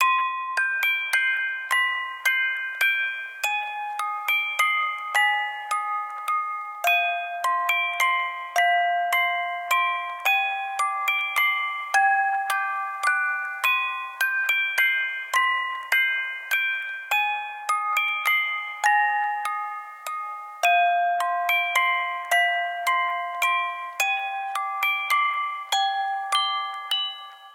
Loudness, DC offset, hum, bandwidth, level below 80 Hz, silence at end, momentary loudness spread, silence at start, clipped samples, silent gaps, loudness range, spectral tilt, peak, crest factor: -23 LUFS; under 0.1%; none; 16.5 kHz; under -90 dBFS; 0 s; 7 LU; 0 s; under 0.1%; none; 2 LU; 5.5 dB/octave; -6 dBFS; 18 dB